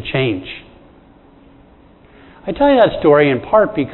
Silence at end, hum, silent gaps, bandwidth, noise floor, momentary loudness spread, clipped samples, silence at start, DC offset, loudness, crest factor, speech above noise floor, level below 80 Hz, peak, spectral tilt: 0 s; none; none; 4.2 kHz; -46 dBFS; 19 LU; under 0.1%; 0 s; under 0.1%; -14 LUFS; 16 dB; 32 dB; -44 dBFS; 0 dBFS; -10 dB/octave